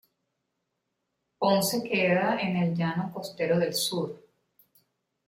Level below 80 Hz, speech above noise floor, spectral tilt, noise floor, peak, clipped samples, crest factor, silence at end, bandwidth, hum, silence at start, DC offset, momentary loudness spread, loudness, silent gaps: -70 dBFS; 54 dB; -4.5 dB/octave; -81 dBFS; -10 dBFS; under 0.1%; 20 dB; 1.1 s; 16.5 kHz; none; 1.4 s; under 0.1%; 9 LU; -27 LUFS; none